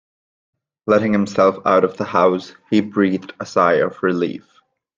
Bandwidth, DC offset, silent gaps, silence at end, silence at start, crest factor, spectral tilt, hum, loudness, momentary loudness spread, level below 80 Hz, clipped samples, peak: 7.6 kHz; under 0.1%; none; 0.6 s; 0.85 s; 18 dB; -6.5 dB/octave; none; -18 LUFS; 10 LU; -62 dBFS; under 0.1%; 0 dBFS